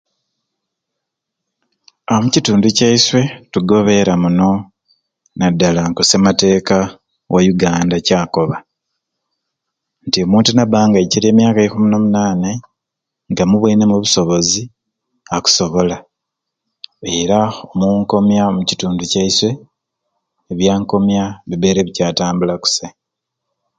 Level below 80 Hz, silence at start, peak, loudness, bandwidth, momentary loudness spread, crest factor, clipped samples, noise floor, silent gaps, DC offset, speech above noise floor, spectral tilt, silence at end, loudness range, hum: -44 dBFS; 2.1 s; 0 dBFS; -14 LUFS; 9.2 kHz; 9 LU; 14 dB; under 0.1%; -80 dBFS; none; under 0.1%; 67 dB; -4.5 dB/octave; 0.9 s; 4 LU; none